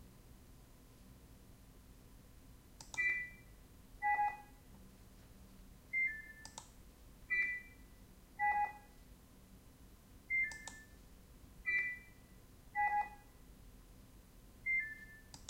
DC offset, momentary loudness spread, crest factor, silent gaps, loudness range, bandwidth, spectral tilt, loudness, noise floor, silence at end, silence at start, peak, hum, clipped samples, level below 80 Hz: under 0.1%; 26 LU; 18 dB; none; 4 LU; 16 kHz; -2.5 dB/octave; -38 LUFS; -61 dBFS; 0 s; 0 s; -26 dBFS; none; under 0.1%; -62 dBFS